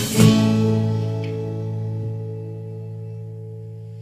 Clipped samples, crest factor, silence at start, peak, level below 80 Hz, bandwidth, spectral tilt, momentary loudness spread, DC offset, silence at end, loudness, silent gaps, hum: under 0.1%; 20 dB; 0 s; -2 dBFS; -48 dBFS; 15.5 kHz; -6.5 dB/octave; 20 LU; under 0.1%; 0 s; -21 LUFS; none; none